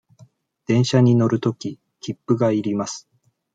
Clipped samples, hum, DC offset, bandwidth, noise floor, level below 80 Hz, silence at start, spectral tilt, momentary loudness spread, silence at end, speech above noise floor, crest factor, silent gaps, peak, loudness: under 0.1%; none; under 0.1%; 9 kHz; -53 dBFS; -62 dBFS; 0.7 s; -6.5 dB/octave; 18 LU; 0.55 s; 34 dB; 18 dB; none; -4 dBFS; -20 LUFS